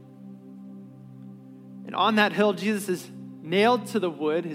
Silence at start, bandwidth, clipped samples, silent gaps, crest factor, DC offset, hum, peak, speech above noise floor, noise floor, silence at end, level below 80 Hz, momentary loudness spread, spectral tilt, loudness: 0 s; 16 kHz; under 0.1%; none; 20 dB; under 0.1%; none; -6 dBFS; 21 dB; -45 dBFS; 0 s; -88 dBFS; 24 LU; -5 dB/octave; -24 LUFS